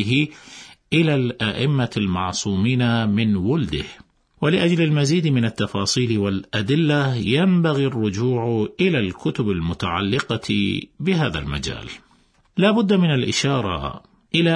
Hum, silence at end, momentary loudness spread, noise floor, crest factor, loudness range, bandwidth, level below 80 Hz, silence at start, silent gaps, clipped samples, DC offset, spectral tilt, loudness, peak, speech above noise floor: none; 0 s; 9 LU; -58 dBFS; 16 dB; 3 LU; 10.5 kHz; -46 dBFS; 0 s; none; under 0.1%; under 0.1%; -5.5 dB/octave; -20 LUFS; -4 dBFS; 38 dB